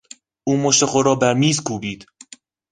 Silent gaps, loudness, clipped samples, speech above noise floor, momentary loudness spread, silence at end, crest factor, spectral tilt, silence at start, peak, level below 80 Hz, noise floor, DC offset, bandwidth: none; -18 LUFS; under 0.1%; 28 dB; 14 LU; 0.7 s; 20 dB; -4 dB/octave; 0.45 s; 0 dBFS; -56 dBFS; -46 dBFS; under 0.1%; 10 kHz